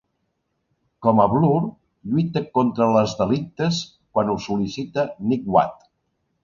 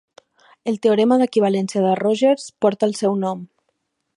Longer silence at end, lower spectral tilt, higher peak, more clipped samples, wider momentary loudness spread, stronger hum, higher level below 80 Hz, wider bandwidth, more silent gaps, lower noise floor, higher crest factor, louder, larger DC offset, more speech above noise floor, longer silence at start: about the same, 0.7 s vs 0.7 s; about the same, -7 dB/octave vs -6 dB/octave; about the same, -2 dBFS vs -4 dBFS; neither; about the same, 8 LU vs 10 LU; neither; first, -54 dBFS vs -70 dBFS; second, 7.4 kHz vs 11.5 kHz; neither; about the same, -73 dBFS vs -72 dBFS; about the same, 20 dB vs 16 dB; about the same, -21 LUFS vs -19 LUFS; neither; about the same, 53 dB vs 54 dB; first, 1 s vs 0.65 s